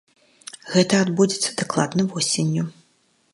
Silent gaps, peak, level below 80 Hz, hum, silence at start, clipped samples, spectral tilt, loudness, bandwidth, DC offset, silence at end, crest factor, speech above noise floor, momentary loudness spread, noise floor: none; -2 dBFS; -66 dBFS; none; 0.65 s; under 0.1%; -4.5 dB/octave; -21 LUFS; 11.5 kHz; under 0.1%; 0.65 s; 20 dB; 42 dB; 17 LU; -63 dBFS